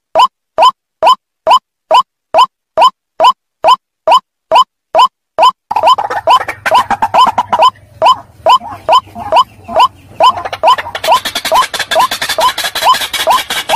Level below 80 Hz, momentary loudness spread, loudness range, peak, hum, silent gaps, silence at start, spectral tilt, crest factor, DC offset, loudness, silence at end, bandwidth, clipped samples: -48 dBFS; 2 LU; 1 LU; 0 dBFS; none; none; 0.15 s; -1 dB/octave; 10 dB; under 0.1%; -10 LUFS; 0 s; 16 kHz; under 0.1%